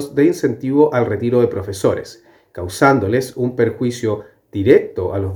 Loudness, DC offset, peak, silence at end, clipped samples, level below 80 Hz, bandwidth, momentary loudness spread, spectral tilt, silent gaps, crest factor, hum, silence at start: -17 LUFS; under 0.1%; 0 dBFS; 0 s; under 0.1%; -52 dBFS; 19.5 kHz; 14 LU; -7 dB/octave; none; 16 dB; none; 0 s